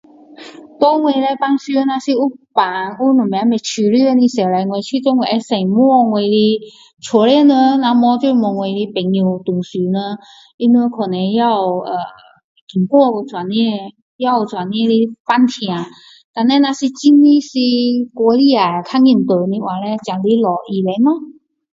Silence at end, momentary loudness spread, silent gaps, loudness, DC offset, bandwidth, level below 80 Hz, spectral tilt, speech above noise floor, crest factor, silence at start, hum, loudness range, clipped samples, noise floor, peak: 0.45 s; 9 LU; 10.54-10.58 s, 12.44-12.55 s, 12.61-12.67 s, 14.02-14.19 s, 15.20-15.25 s, 16.24-16.34 s; -14 LUFS; under 0.1%; 7.8 kHz; -64 dBFS; -6 dB/octave; 24 dB; 14 dB; 0.4 s; none; 4 LU; under 0.1%; -38 dBFS; 0 dBFS